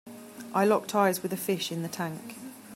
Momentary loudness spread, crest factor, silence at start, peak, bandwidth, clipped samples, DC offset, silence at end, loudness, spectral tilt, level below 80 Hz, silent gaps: 18 LU; 20 dB; 0.05 s; -10 dBFS; 16 kHz; under 0.1%; under 0.1%; 0 s; -28 LUFS; -4.5 dB/octave; -76 dBFS; none